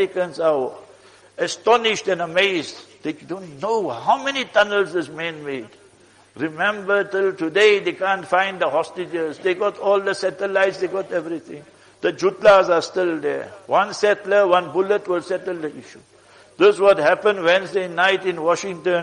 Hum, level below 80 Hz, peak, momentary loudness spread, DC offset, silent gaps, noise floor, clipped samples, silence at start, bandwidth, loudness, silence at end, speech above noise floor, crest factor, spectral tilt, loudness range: none; -62 dBFS; -4 dBFS; 14 LU; under 0.1%; none; -52 dBFS; under 0.1%; 0 s; 10.5 kHz; -20 LUFS; 0 s; 32 dB; 16 dB; -4 dB/octave; 4 LU